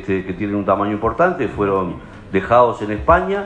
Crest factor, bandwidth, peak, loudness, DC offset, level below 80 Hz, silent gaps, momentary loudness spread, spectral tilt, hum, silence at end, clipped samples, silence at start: 18 dB; 9.4 kHz; 0 dBFS; -18 LUFS; under 0.1%; -36 dBFS; none; 8 LU; -8 dB/octave; none; 0 s; under 0.1%; 0 s